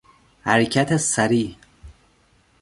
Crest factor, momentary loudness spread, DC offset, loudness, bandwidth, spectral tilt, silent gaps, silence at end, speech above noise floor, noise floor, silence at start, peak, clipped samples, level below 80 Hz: 22 dB; 10 LU; under 0.1%; -20 LUFS; 11.5 kHz; -4 dB/octave; none; 0.7 s; 40 dB; -59 dBFS; 0.45 s; -2 dBFS; under 0.1%; -52 dBFS